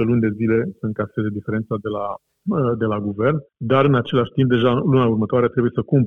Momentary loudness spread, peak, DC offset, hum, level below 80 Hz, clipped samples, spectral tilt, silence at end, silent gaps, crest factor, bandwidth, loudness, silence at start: 9 LU; -4 dBFS; 0.2%; none; -54 dBFS; under 0.1%; -10 dB/octave; 0 s; none; 14 dB; 3.9 kHz; -20 LUFS; 0 s